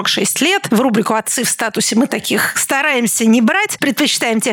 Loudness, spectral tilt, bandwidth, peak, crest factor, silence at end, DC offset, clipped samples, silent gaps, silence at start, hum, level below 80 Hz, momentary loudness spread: -14 LUFS; -2.5 dB/octave; over 20 kHz; -2 dBFS; 12 dB; 0 s; under 0.1%; under 0.1%; none; 0 s; none; -68 dBFS; 4 LU